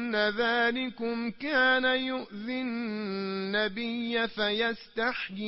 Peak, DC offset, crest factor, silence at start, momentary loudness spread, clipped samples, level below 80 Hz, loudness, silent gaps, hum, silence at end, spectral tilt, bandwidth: -14 dBFS; under 0.1%; 16 dB; 0 s; 9 LU; under 0.1%; -64 dBFS; -29 LUFS; none; none; 0 s; -8 dB/octave; 5.8 kHz